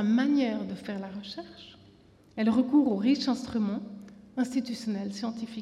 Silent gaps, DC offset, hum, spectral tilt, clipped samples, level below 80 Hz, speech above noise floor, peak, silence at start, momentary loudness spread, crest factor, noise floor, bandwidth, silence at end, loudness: none; under 0.1%; none; -6 dB/octave; under 0.1%; -66 dBFS; 29 dB; -14 dBFS; 0 s; 18 LU; 16 dB; -57 dBFS; 11.5 kHz; 0 s; -29 LUFS